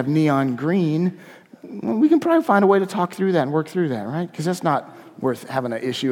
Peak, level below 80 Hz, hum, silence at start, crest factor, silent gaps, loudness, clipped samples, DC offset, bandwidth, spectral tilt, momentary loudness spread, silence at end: -2 dBFS; -70 dBFS; none; 0 s; 18 dB; none; -21 LUFS; under 0.1%; under 0.1%; 16 kHz; -7 dB/octave; 10 LU; 0 s